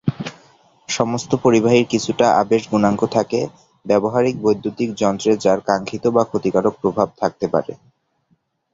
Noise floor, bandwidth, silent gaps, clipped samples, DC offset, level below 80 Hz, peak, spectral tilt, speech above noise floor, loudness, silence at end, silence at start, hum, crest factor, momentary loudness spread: -64 dBFS; 8 kHz; none; under 0.1%; under 0.1%; -54 dBFS; -2 dBFS; -5.5 dB/octave; 47 dB; -18 LUFS; 1 s; 0.05 s; none; 18 dB; 8 LU